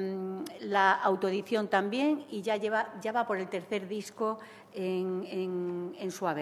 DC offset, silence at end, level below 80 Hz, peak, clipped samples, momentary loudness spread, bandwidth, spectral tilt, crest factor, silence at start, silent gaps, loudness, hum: under 0.1%; 0 s; -84 dBFS; -10 dBFS; under 0.1%; 11 LU; 14 kHz; -5.5 dB/octave; 20 dB; 0 s; none; -32 LUFS; none